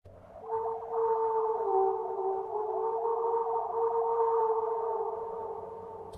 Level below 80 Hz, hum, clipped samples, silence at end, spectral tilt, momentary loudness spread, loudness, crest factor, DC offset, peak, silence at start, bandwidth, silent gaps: -70 dBFS; none; under 0.1%; 0 s; -8 dB/octave; 10 LU; -31 LUFS; 14 dB; under 0.1%; -18 dBFS; 0.05 s; 2.8 kHz; none